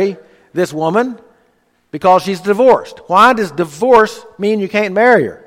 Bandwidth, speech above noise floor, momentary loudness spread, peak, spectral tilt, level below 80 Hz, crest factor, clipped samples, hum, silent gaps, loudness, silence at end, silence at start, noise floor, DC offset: 15.5 kHz; 45 dB; 10 LU; 0 dBFS; -5.5 dB/octave; -54 dBFS; 14 dB; under 0.1%; none; none; -13 LUFS; 0.1 s; 0 s; -58 dBFS; under 0.1%